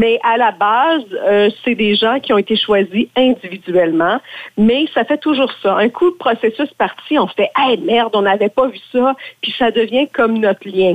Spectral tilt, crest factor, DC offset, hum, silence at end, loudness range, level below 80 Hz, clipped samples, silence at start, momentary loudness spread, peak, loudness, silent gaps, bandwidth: -6.5 dB/octave; 12 dB; under 0.1%; none; 0 s; 1 LU; -54 dBFS; under 0.1%; 0 s; 4 LU; -4 dBFS; -15 LUFS; none; 9 kHz